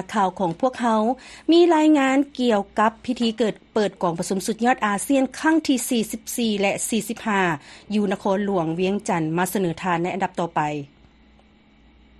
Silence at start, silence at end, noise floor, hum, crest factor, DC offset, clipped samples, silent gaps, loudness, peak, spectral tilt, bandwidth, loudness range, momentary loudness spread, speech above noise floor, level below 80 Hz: 0 s; 1.35 s; -54 dBFS; none; 16 dB; under 0.1%; under 0.1%; none; -22 LUFS; -6 dBFS; -4.5 dB/octave; 13 kHz; 4 LU; 8 LU; 33 dB; -58 dBFS